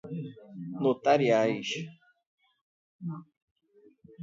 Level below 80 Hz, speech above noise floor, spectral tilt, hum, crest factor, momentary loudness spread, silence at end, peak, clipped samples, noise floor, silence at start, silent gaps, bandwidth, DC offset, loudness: -78 dBFS; 34 dB; -6 dB/octave; none; 20 dB; 20 LU; 0 s; -10 dBFS; under 0.1%; -61 dBFS; 0.05 s; 2.26-2.38 s, 2.61-2.99 s, 3.37-3.56 s; 7.8 kHz; under 0.1%; -28 LUFS